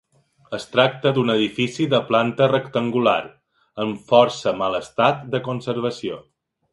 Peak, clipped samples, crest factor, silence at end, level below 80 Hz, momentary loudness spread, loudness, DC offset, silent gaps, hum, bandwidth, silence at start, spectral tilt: 0 dBFS; under 0.1%; 20 dB; 0.5 s; -62 dBFS; 13 LU; -20 LUFS; under 0.1%; none; none; 11.5 kHz; 0.5 s; -6 dB/octave